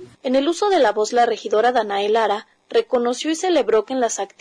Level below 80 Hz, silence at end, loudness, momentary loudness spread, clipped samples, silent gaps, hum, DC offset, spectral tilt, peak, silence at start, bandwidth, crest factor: -62 dBFS; 0.15 s; -19 LUFS; 5 LU; under 0.1%; none; none; under 0.1%; -2.5 dB/octave; -8 dBFS; 0 s; 10.5 kHz; 10 dB